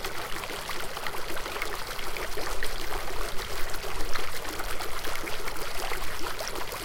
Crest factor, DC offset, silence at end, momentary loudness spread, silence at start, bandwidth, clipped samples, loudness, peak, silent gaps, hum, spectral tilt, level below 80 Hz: 14 dB; under 0.1%; 0 s; 1 LU; 0 s; 17 kHz; under 0.1%; -34 LUFS; -10 dBFS; none; none; -2.5 dB/octave; -38 dBFS